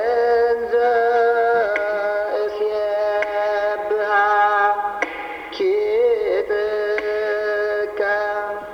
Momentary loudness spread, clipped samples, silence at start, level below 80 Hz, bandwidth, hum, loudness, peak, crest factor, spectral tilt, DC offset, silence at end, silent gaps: 6 LU; under 0.1%; 0 s; -56 dBFS; 6.6 kHz; none; -19 LUFS; -6 dBFS; 14 dB; -4 dB/octave; under 0.1%; 0 s; none